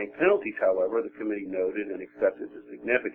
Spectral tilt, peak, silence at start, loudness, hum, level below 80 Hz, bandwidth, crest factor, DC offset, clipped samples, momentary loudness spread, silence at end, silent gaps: -8.5 dB/octave; -8 dBFS; 0 s; -28 LUFS; none; -68 dBFS; 3.5 kHz; 20 dB; under 0.1%; under 0.1%; 13 LU; 0 s; none